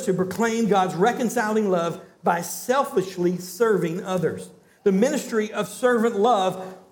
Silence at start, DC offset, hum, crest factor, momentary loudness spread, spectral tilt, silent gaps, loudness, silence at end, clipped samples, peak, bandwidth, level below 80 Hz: 0 s; under 0.1%; none; 16 dB; 6 LU; -5.5 dB/octave; none; -23 LUFS; 0.15 s; under 0.1%; -6 dBFS; 19 kHz; -70 dBFS